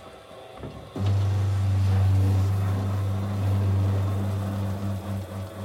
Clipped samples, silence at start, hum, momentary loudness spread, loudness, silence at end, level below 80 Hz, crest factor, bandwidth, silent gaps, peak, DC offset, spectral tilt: under 0.1%; 0 s; none; 17 LU; -26 LUFS; 0 s; -52 dBFS; 10 dB; 12.5 kHz; none; -14 dBFS; under 0.1%; -8 dB/octave